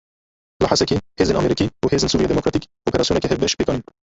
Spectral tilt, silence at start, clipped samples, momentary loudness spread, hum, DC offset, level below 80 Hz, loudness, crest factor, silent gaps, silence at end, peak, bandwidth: -5 dB/octave; 0.6 s; under 0.1%; 6 LU; none; under 0.1%; -38 dBFS; -20 LUFS; 18 dB; none; 0.35 s; -2 dBFS; 8 kHz